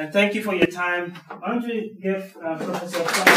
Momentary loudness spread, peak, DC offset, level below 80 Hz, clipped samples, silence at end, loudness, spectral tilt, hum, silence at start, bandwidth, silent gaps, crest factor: 9 LU; 0 dBFS; under 0.1%; -64 dBFS; under 0.1%; 0 s; -24 LUFS; -3.5 dB/octave; none; 0 s; 15.5 kHz; none; 22 dB